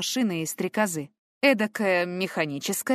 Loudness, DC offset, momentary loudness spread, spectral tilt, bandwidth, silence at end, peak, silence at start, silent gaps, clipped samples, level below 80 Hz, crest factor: -26 LUFS; under 0.1%; 7 LU; -3.5 dB/octave; 15.5 kHz; 0 s; -6 dBFS; 0 s; 1.19-1.41 s; under 0.1%; -74 dBFS; 20 dB